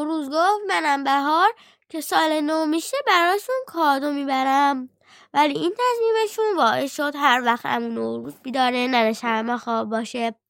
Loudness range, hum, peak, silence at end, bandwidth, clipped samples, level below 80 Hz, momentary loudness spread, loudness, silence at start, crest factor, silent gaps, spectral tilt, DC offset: 1 LU; none; -4 dBFS; 0.15 s; 17 kHz; under 0.1%; -78 dBFS; 8 LU; -21 LUFS; 0 s; 18 dB; none; -3 dB/octave; under 0.1%